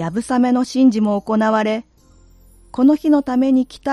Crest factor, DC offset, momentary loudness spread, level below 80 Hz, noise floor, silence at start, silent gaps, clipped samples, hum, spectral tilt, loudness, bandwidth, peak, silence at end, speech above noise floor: 14 dB; under 0.1%; 6 LU; -50 dBFS; -49 dBFS; 0 s; none; under 0.1%; none; -6.5 dB/octave; -17 LUFS; 11 kHz; -4 dBFS; 0 s; 33 dB